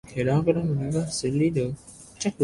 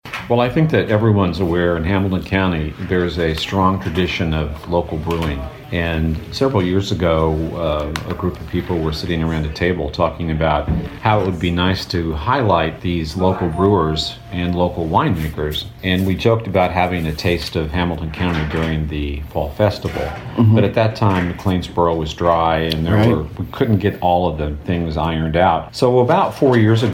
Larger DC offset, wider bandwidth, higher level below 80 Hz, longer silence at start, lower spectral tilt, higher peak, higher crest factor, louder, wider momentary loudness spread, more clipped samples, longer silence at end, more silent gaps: neither; second, 11.5 kHz vs 16.5 kHz; second, -52 dBFS vs -32 dBFS; about the same, 0.05 s vs 0.05 s; about the same, -6 dB/octave vs -7 dB/octave; second, -8 dBFS vs -2 dBFS; about the same, 18 dB vs 16 dB; second, -25 LUFS vs -18 LUFS; about the same, 9 LU vs 7 LU; neither; about the same, 0 s vs 0 s; neither